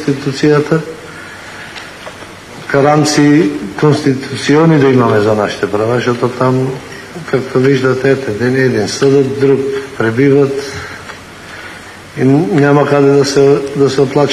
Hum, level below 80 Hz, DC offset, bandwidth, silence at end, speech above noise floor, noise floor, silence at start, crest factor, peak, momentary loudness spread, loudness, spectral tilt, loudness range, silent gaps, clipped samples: none; -48 dBFS; under 0.1%; 13 kHz; 0 s; 20 dB; -30 dBFS; 0 s; 12 dB; 0 dBFS; 19 LU; -11 LUFS; -6 dB/octave; 3 LU; none; under 0.1%